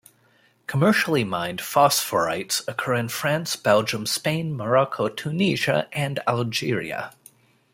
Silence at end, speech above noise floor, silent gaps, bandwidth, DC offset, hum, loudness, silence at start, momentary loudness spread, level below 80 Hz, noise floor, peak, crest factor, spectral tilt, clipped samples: 0.65 s; 38 dB; none; 16.5 kHz; under 0.1%; none; -23 LUFS; 0.7 s; 8 LU; -62 dBFS; -61 dBFS; -4 dBFS; 20 dB; -4 dB/octave; under 0.1%